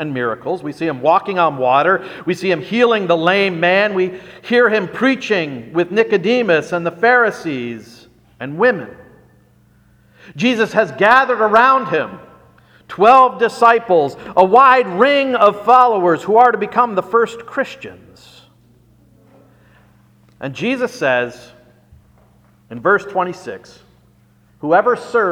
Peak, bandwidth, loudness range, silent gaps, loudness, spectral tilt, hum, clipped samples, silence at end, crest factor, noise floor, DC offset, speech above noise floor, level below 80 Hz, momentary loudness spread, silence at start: 0 dBFS; 12 kHz; 11 LU; none; -14 LUFS; -5.5 dB/octave; none; under 0.1%; 0 s; 16 dB; -52 dBFS; under 0.1%; 38 dB; -58 dBFS; 14 LU; 0 s